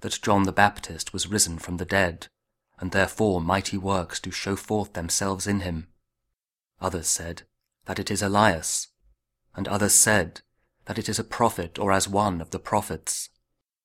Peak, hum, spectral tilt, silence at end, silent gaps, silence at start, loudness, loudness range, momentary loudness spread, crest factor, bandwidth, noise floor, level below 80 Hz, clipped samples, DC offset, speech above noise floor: -2 dBFS; none; -3.5 dB/octave; 0.6 s; none; 0 s; -24 LUFS; 6 LU; 14 LU; 24 dB; 16 kHz; -84 dBFS; -50 dBFS; under 0.1%; under 0.1%; 59 dB